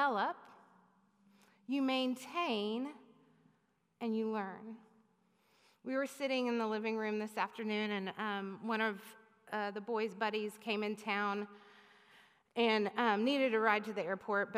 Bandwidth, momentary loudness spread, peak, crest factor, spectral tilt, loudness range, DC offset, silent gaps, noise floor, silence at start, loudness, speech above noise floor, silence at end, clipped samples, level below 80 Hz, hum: 15.5 kHz; 13 LU; -16 dBFS; 20 dB; -5 dB/octave; 6 LU; under 0.1%; none; -76 dBFS; 0 s; -36 LUFS; 40 dB; 0 s; under 0.1%; under -90 dBFS; none